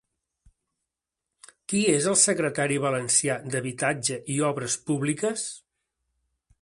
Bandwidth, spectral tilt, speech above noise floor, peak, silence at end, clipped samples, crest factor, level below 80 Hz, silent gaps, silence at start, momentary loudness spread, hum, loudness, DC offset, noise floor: 11.5 kHz; -3.5 dB/octave; 61 dB; -6 dBFS; 1.05 s; under 0.1%; 22 dB; -66 dBFS; none; 1.7 s; 10 LU; none; -24 LUFS; under 0.1%; -86 dBFS